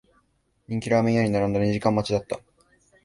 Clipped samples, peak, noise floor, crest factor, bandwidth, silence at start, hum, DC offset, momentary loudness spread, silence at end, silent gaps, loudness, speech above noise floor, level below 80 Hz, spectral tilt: under 0.1%; -6 dBFS; -68 dBFS; 20 dB; 11.5 kHz; 0.7 s; none; under 0.1%; 12 LU; 0.65 s; none; -24 LUFS; 45 dB; -52 dBFS; -7 dB/octave